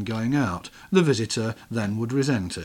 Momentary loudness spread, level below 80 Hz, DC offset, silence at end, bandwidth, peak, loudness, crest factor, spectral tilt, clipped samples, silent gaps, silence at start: 8 LU; -54 dBFS; under 0.1%; 0 s; 17 kHz; -6 dBFS; -25 LUFS; 20 dB; -5.5 dB/octave; under 0.1%; none; 0 s